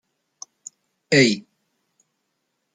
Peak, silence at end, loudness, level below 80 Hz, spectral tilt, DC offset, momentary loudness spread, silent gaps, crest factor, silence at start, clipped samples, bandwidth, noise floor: -2 dBFS; 1.35 s; -19 LUFS; -68 dBFS; -4 dB/octave; under 0.1%; 26 LU; none; 22 dB; 1.1 s; under 0.1%; 9.6 kHz; -75 dBFS